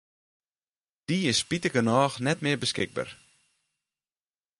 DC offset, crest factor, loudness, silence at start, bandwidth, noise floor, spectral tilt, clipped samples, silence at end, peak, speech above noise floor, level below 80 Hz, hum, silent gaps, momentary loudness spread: under 0.1%; 22 dB; -26 LUFS; 1.1 s; 11.5 kHz; under -90 dBFS; -4 dB/octave; under 0.1%; 1.45 s; -8 dBFS; over 63 dB; -64 dBFS; none; none; 10 LU